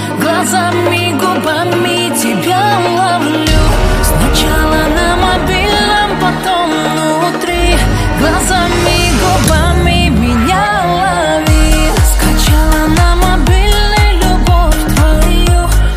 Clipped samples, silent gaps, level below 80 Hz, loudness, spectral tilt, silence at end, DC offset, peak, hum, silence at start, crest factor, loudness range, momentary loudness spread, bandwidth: under 0.1%; none; -14 dBFS; -11 LUFS; -4.5 dB/octave; 0 s; under 0.1%; 0 dBFS; none; 0 s; 10 dB; 1 LU; 2 LU; 15.5 kHz